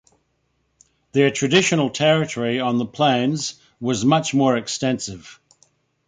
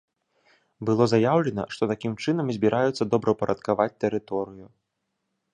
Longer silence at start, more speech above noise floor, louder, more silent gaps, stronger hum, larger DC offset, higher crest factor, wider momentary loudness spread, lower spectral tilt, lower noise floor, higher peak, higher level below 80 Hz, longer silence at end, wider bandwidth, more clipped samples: first, 1.15 s vs 0.8 s; second, 49 dB vs 55 dB; first, -20 LUFS vs -25 LUFS; neither; neither; neither; about the same, 18 dB vs 20 dB; about the same, 10 LU vs 9 LU; second, -4.5 dB/octave vs -7 dB/octave; second, -69 dBFS vs -79 dBFS; first, -2 dBFS vs -6 dBFS; about the same, -58 dBFS vs -60 dBFS; second, 0.75 s vs 0.9 s; about the same, 9.6 kHz vs 10 kHz; neither